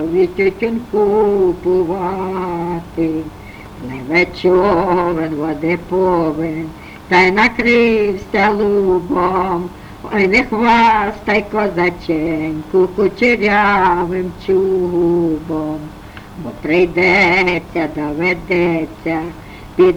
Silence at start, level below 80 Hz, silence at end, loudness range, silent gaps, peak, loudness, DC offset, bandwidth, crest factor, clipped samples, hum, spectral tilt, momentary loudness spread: 0 s; -38 dBFS; 0 s; 3 LU; none; 0 dBFS; -15 LUFS; under 0.1%; 11.5 kHz; 14 dB; under 0.1%; none; -6.5 dB/octave; 14 LU